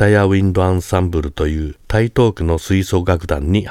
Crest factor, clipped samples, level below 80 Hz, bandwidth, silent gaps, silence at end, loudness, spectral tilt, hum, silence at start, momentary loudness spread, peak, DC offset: 16 dB; under 0.1%; -28 dBFS; 14.5 kHz; none; 0 s; -16 LUFS; -7 dB/octave; none; 0 s; 6 LU; 0 dBFS; under 0.1%